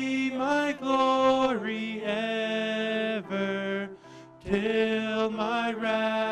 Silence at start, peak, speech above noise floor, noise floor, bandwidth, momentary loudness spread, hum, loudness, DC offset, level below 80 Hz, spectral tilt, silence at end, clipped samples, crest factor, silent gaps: 0 s; -8 dBFS; 21 dB; -49 dBFS; 11 kHz; 8 LU; none; -27 LUFS; under 0.1%; -60 dBFS; -5 dB/octave; 0 s; under 0.1%; 18 dB; none